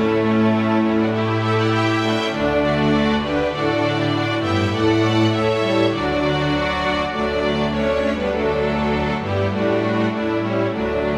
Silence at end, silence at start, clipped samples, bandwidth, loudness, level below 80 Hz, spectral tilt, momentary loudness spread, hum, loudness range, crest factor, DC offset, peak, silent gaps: 0 s; 0 s; under 0.1%; 11 kHz; -19 LUFS; -38 dBFS; -6.5 dB/octave; 4 LU; none; 2 LU; 14 dB; under 0.1%; -6 dBFS; none